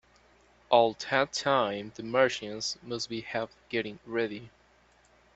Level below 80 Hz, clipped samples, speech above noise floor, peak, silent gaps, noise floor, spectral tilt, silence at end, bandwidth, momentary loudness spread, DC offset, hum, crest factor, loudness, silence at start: -68 dBFS; under 0.1%; 33 dB; -8 dBFS; none; -63 dBFS; -3.5 dB/octave; 0.9 s; 8.2 kHz; 11 LU; under 0.1%; none; 22 dB; -30 LUFS; 0.7 s